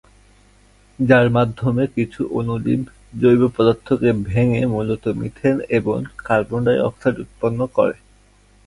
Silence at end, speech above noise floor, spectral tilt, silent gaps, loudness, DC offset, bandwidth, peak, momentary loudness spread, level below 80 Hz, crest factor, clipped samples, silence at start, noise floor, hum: 0.75 s; 34 dB; -8.5 dB/octave; none; -19 LUFS; under 0.1%; 11.5 kHz; 0 dBFS; 9 LU; -44 dBFS; 18 dB; under 0.1%; 1 s; -52 dBFS; none